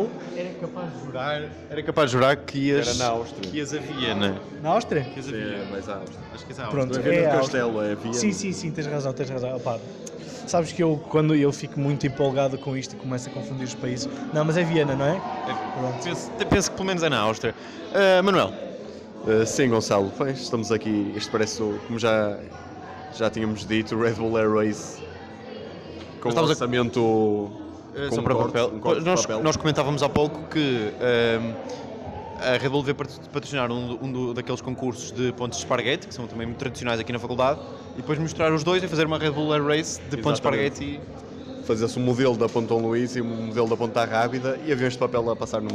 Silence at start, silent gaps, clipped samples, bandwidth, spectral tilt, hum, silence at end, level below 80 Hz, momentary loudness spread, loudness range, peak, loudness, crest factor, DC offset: 0 s; none; under 0.1%; 13.5 kHz; -5 dB/octave; none; 0 s; -52 dBFS; 13 LU; 4 LU; -10 dBFS; -25 LUFS; 16 dB; under 0.1%